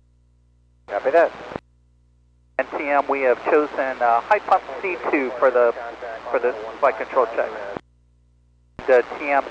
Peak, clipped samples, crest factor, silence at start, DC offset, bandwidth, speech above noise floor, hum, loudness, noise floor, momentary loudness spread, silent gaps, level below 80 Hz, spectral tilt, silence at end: -6 dBFS; under 0.1%; 16 dB; 0.9 s; under 0.1%; 8 kHz; 37 dB; 60 Hz at -55 dBFS; -21 LUFS; -57 dBFS; 14 LU; none; -58 dBFS; -5.5 dB/octave; 0 s